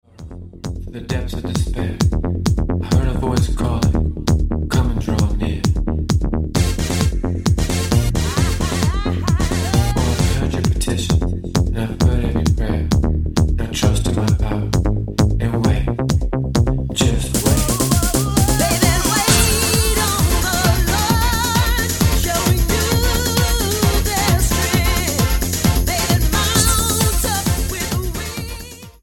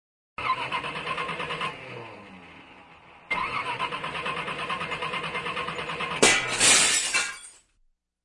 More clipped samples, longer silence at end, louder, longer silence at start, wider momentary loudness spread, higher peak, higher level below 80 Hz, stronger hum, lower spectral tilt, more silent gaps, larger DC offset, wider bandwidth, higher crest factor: neither; second, 0.1 s vs 0.7 s; first, -18 LUFS vs -25 LUFS; second, 0.2 s vs 0.4 s; second, 6 LU vs 21 LU; first, 0 dBFS vs -4 dBFS; first, -22 dBFS vs -58 dBFS; neither; first, -4.5 dB/octave vs -0.5 dB/octave; neither; neither; first, 17.5 kHz vs 11.5 kHz; second, 16 dB vs 24 dB